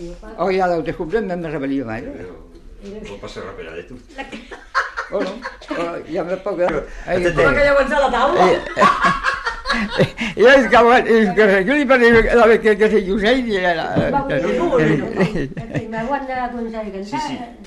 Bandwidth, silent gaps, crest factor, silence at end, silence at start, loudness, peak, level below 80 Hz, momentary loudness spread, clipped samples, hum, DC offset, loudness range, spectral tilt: 11.5 kHz; none; 16 dB; 0 s; 0 s; -16 LUFS; -2 dBFS; -36 dBFS; 21 LU; under 0.1%; none; under 0.1%; 15 LU; -5.5 dB/octave